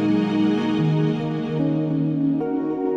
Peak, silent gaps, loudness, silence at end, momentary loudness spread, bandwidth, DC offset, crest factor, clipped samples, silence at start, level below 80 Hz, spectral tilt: -10 dBFS; none; -22 LUFS; 0 s; 4 LU; 7 kHz; under 0.1%; 12 dB; under 0.1%; 0 s; -58 dBFS; -9 dB/octave